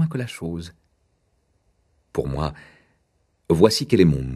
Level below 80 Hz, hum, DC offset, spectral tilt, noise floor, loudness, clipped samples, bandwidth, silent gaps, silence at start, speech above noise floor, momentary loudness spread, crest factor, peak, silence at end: -42 dBFS; none; under 0.1%; -6.5 dB/octave; -67 dBFS; -21 LUFS; under 0.1%; 13 kHz; none; 0 s; 47 dB; 14 LU; 24 dB; 0 dBFS; 0 s